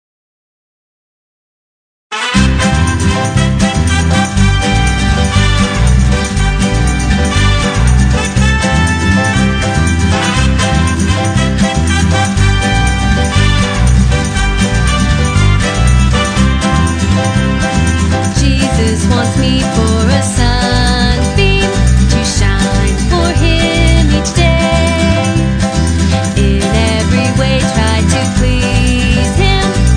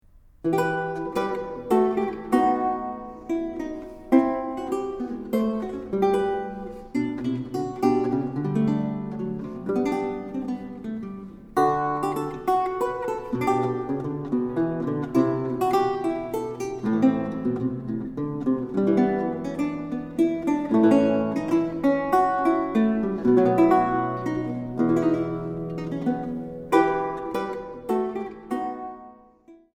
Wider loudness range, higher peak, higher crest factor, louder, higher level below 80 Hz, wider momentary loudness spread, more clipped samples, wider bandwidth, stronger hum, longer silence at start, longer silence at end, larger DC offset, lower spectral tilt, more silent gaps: second, 1 LU vs 5 LU; first, 0 dBFS vs -6 dBFS; second, 10 dB vs 20 dB; first, -11 LUFS vs -25 LUFS; first, -16 dBFS vs -52 dBFS; second, 2 LU vs 10 LU; neither; second, 10 kHz vs 16 kHz; neither; first, 2.1 s vs 0.45 s; second, 0 s vs 0.2 s; neither; second, -5 dB/octave vs -7.5 dB/octave; neither